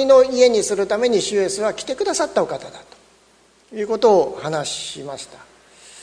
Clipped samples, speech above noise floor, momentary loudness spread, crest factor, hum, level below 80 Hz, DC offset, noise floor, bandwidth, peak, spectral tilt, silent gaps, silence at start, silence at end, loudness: under 0.1%; 36 dB; 17 LU; 18 dB; none; -58 dBFS; under 0.1%; -55 dBFS; 10.5 kHz; -2 dBFS; -3 dB/octave; none; 0 s; 0 s; -19 LUFS